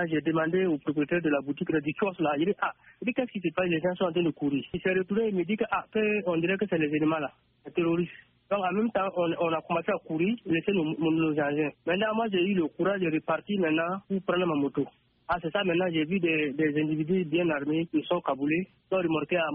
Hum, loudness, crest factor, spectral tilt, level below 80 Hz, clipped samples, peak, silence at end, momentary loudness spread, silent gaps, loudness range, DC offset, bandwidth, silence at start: none; -28 LUFS; 14 dB; -5 dB/octave; -64 dBFS; under 0.1%; -14 dBFS; 0 s; 4 LU; none; 1 LU; under 0.1%; 3.8 kHz; 0 s